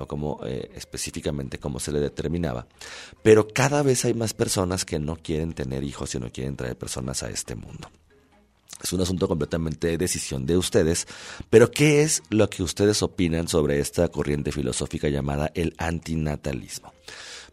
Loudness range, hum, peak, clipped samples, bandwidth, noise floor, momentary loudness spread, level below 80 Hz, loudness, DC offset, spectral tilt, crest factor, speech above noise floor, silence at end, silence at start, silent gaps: 9 LU; none; -2 dBFS; under 0.1%; 15.5 kHz; -60 dBFS; 17 LU; -42 dBFS; -24 LUFS; under 0.1%; -5 dB/octave; 22 dB; 35 dB; 0.05 s; 0 s; none